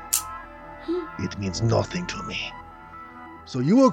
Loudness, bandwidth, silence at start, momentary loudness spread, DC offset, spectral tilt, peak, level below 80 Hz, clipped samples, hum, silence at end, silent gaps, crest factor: -26 LUFS; 17 kHz; 0 s; 19 LU; under 0.1%; -5 dB/octave; -4 dBFS; -50 dBFS; under 0.1%; none; 0 s; none; 22 dB